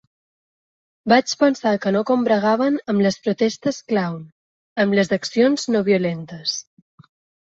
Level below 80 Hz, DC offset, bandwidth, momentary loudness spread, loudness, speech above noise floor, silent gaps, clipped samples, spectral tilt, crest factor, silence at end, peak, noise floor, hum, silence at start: -64 dBFS; under 0.1%; 8 kHz; 8 LU; -20 LUFS; over 71 dB; 4.32-4.76 s; under 0.1%; -5 dB/octave; 18 dB; 0.85 s; -2 dBFS; under -90 dBFS; none; 1.05 s